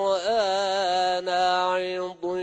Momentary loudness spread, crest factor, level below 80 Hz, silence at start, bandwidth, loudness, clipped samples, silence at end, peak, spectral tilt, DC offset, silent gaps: 7 LU; 12 dB; -64 dBFS; 0 s; 9.6 kHz; -24 LUFS; under 0.1%; 0 s; -12 dBFS; -3 dB/octave; under 0.1%; none